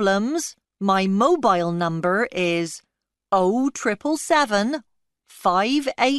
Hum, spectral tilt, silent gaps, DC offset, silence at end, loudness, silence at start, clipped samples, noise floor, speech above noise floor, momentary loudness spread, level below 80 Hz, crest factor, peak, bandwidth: none; -4.5 dB/octave; none; under 0.1%; 0 s; -21 LUFS; 0 s; under 0.1%; -55 dBFS; 34 dB; 9 LU; -62 dBFS; 16 dB; -6 dBFS; 12 kHz